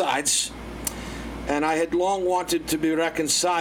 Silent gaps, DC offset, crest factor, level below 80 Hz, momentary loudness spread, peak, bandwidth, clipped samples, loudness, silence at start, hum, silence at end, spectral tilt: none; under 0.1%; 16 dB; -44 dBFS; 10 LU; -8 dBFS; 18.5 kHz; under 0.1%; -24 LUFS; 0 s; none; 0 s; -2.5 dB/octave